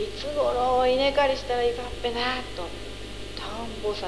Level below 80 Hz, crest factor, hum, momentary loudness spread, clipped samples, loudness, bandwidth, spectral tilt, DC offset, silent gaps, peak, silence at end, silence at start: -42 dBFS; 16 dB; 50 Hz at -40 dBFS; 15 LU; under 0.1%; -26 LUFS; 11 kHz; -4 dB/octave; 0.8%; none; -10 dBFS; 0 s; 0 s